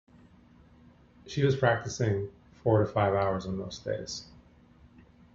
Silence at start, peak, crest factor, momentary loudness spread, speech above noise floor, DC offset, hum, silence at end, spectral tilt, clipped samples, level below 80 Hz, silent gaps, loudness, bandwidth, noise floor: 1.25 s; -8 dBFS; 22 dB; 12 LU; 29 dB; under 0.1%; none; 1.1 s; -6 dB/octave; under 0.1%; -54 dBFS; none; -29 LUFS; 7.8 kHz; -57 dBFS